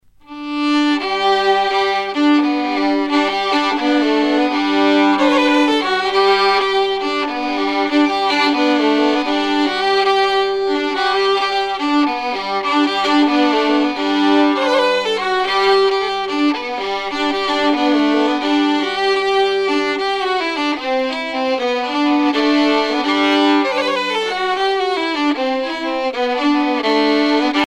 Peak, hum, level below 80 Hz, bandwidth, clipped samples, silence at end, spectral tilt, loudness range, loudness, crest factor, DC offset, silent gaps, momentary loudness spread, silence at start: -2 dBFS; none; -54 dBFS; 10 kHz; under 0.1%; 0 s; -3 dB/octave; 2 LU; -16 LUFS; 12 dB; under 0.1%; none; 5 LU; 0.3 s